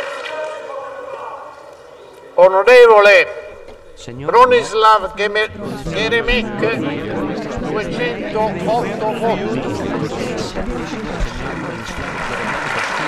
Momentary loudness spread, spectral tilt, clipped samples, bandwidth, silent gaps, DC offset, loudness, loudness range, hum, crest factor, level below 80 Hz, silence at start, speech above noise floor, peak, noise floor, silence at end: 19 LU; -5 dB/octave; under 0.1%; 13 kHz; none; under 0.1%; -15 LUFS; 10 LU; none; 16 dB; -34 dBFS; 0 s; 24 dB; 0 dBFS; -39 dBFS; 0 s